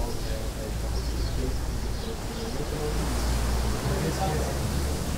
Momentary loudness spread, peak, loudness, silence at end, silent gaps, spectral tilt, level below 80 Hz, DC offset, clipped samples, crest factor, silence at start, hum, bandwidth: 5 LU; -14 dBFS; -30 LUFS; 0 s; none; -5 dB/octave; -30 dBFS; under 0.1%; under 0.1%; 14 dB; 0 s; none; 16 kHz